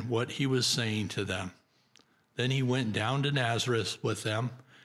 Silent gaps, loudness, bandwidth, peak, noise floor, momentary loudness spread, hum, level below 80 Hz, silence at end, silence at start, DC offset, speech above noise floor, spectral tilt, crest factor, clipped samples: none; -30 LUFS; 14.5 kHz; -16 dBFS; -65 dBFS; 7 LU; none; -72 dBFS; 0.25 s; 0 s; under 0.1%; 35 dB; -4.5 dB/octave; 16 dB; under 0.1%